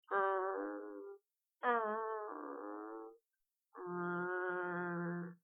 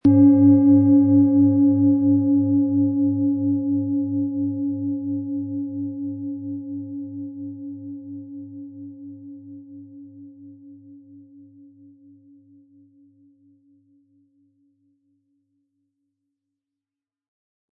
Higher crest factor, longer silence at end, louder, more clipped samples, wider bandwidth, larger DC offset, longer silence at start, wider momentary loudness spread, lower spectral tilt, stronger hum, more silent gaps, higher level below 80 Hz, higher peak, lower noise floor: about the same, 20 dB vs 16 dB; second, 0.1 s vs 6.75 s; second, -41 LUFS vs -19 LUFS; neither; first, 3.7 kHz vs 1.7 kHz; neither; about the same, 0.1 s vs 0.05 s; second, 16 LU vs 24 LU; second, -1.5 dB/octave vs -13.5 dB/octave; neither; neither; second, under -90 dBFS vs -68 dBFS; second, -22 dBFS vs -6 dBFS; about the same, -90 dBFS vs -90 dBFS